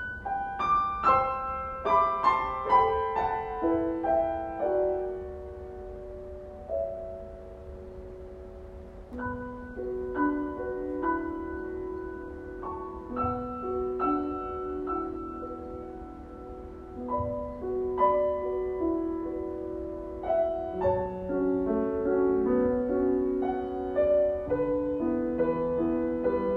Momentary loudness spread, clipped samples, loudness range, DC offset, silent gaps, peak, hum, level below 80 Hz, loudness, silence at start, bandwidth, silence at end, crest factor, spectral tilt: 18 LU; under 0.1%; 10 LU; under 0.1%; none; -10 dBFS; none; -48 dBFS; -29 LUFS; 0 s; 6.8 kHz; 0 s; 20 dB; -8.5 dB/octave